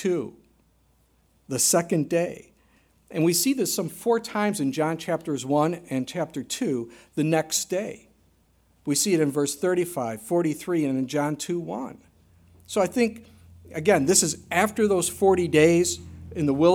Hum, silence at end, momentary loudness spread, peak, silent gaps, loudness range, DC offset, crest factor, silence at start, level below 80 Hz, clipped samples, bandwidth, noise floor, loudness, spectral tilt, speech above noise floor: none; 0 s; 12 LU; -6 dBFS; none; 6 LU; under 0.1%; 20 dB; 0 s; -58 dBFS; under 0.1%; 17.5 kHz; -63 dBFS; -24 LUFS; -4 dB/octave; 39 dB